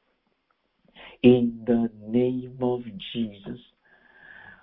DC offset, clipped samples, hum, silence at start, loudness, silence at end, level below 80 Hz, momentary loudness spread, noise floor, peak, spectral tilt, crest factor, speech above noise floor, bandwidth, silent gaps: under 0.1%; under 0.1%; none; 1 s; -25 LUFS; 1.05 s; -58 dBFS; 22 LU; -72 dBFS; -4 dBFS; -11.5 dB/octave; 22 dB; 48 dB; 4 kHz; none